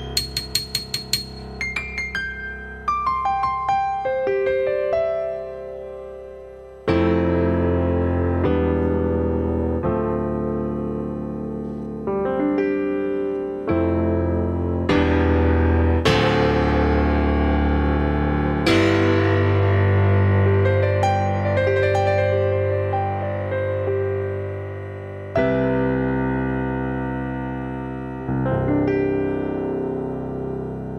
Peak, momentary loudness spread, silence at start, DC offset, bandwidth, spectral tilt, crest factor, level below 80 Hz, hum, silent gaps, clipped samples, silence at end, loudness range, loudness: -4 dBFS; 11 LU; 0 s; under 0.1%; 14.5 kHz; -6.5 dB/octave; 18 dB; -32 dBFS; none; none; under 0.1%; 0 s; 6 LU; -21 LUFS